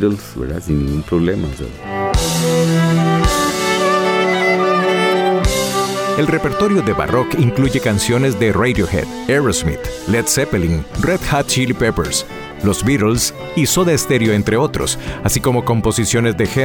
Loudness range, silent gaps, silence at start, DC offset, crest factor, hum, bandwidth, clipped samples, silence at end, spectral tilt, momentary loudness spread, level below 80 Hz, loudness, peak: 2 LU; none; 0 s; under 0.1%; 12 dB; none; 19 kHz; under 0.1%; 0 s; -4.5 dB/octave; 6 LU; -30 dBFS; -16 LUFS; -4 dBFS